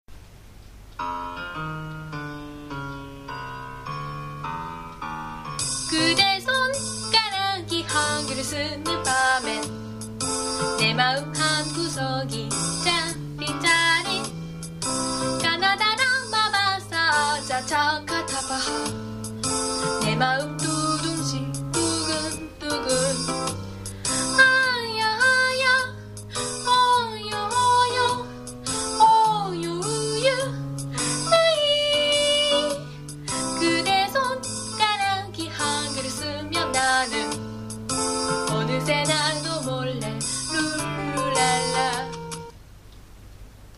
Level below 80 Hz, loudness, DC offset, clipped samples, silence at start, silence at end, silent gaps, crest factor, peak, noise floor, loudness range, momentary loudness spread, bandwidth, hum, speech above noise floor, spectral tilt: -48 dBFS; -23 LUFS; under 0.1%; under 0.1%; 0.1 s; 0 s; none; 20 dB; -4 dBFS; -45 dBFS; 5 LU; 15 LU; 15.5 kHz; none; 22 dB; -2.5 dB/octave